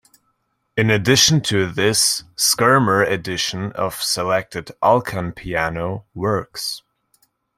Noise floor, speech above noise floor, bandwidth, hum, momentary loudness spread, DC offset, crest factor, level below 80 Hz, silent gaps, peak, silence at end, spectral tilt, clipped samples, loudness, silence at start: -69 dBFS; 50 dB; 16.5 kHz; none; 13 LU; under 0.1%; 20 dB; -50 dBFS; none; 0 dBFS; 0.8 s; -3.5 dB/octave; under 0.1%; -18 LUFS; 0.75 s